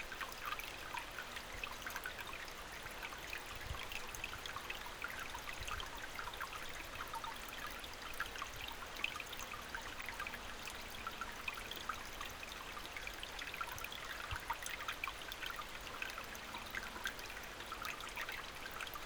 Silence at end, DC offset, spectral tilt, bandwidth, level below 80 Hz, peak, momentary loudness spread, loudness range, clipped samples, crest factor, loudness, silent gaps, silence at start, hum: 0 s; under 0.1%; -2 dB/octave; over 20 kHz; -58 dBFS; -22 dBFS; 4 LU; 1 LU; under 0.1%; 24 dB; -45 LUFS; none; 0 s; none